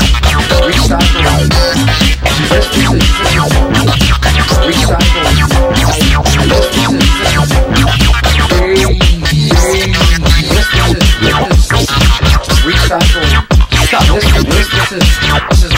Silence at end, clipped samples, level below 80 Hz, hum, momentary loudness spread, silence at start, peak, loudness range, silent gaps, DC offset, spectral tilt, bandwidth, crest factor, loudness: 0 s; 0.3%; -12 dBFS; none; 1 LU; 0 s; 0 dBFS; 0 LU; none; under 0.1%; -4.5 dB/octave; 16.5 kHz; 8 dB; -9 LUFS